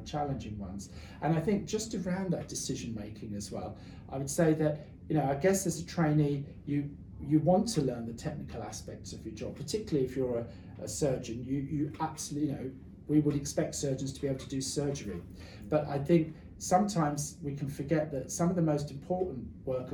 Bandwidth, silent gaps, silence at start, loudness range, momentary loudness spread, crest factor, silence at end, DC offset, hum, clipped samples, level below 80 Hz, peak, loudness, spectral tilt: 19.5 kHz; none; 0 s; 4 LU; 14 LU; 20 dB; 0 s; under 0.1%; none; under 0.1%; -56 dBFS; -12 dBFS; -33 LUFS; -6 dB/octave